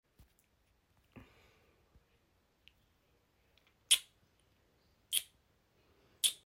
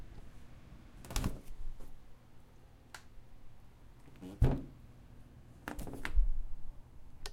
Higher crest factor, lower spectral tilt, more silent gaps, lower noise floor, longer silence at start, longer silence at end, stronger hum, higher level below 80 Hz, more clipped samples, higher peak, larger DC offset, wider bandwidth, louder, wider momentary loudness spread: first, 32 dB vs 22 dB; second, 2.5 dB/octave vs -6 dB/octave; neither; first, -75 dBFS vs -57 dBFS; first, 1.15 s vs 0 s; about the same, 0.1 s vs 0 s; neither; second, -76 dBFS vs -40 dBFS; neither; first, -10 dBFS vs -16 dBFS; neither; about the same, 16.5 kHz vs 16 kHz; first, -33 LUFS vs -40 LUFS; second, 6 LU vs 25 LU